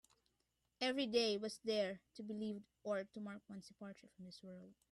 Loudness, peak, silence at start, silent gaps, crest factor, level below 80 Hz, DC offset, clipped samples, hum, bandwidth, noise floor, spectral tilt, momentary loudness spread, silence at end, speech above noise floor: -42 LUFS; -24 dBFS; 0.8 s; none; 20 dB; -84 dBFS; under 0.1%; under 0.1%; none; 12.5 kHz; -85 dBFS; -4 dB/octave; 19 LU; 0.2 s; 41 dB